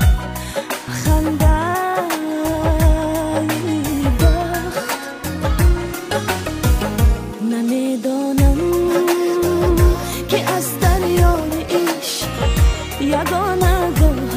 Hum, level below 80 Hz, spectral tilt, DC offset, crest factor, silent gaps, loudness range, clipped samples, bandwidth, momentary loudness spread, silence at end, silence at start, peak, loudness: none; -20 dBFS; -5.5 dB/octave; under 0.1%; 14 dB; none; 2 LU; under 0.1%; 16 kHz; 7 LU; 0 s; 0 s; -2 dBFS; -18 LUFS